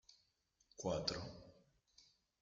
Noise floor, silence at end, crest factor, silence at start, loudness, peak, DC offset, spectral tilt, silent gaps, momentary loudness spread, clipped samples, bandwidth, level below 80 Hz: -81 dBFS; 0.4 s; 28 dB; 0.1 s; -44 LUFS; -20 dBFS; under 0.1%; -4 dB/octave; none; 23 LU; under 0.1%; 9 kHz; -70 dBFS